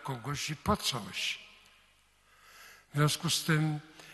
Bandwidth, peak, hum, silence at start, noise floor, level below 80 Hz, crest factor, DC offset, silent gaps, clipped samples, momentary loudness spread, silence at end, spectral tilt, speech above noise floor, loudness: 12.5 kHz; -14 dBFS; none; 0 s; -66 dBFS; -60 dBFS; 20 dB; under 0.1%; none; under 0.1%; 15 LU; 0 s; -4 dB/octave; 34 dB; -32 LUFS